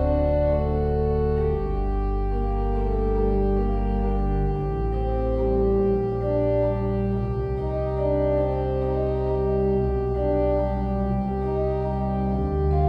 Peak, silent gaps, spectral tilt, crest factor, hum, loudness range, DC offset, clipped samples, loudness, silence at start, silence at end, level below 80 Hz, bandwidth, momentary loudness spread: -10 dBFS; none; -11 dB/octave; 12 dB; none; 1 LU; under 0.1%; under 0.1%; -24 LUFS; 0 s; 0 s; -28 dBFS; 5 kHz; 4 LU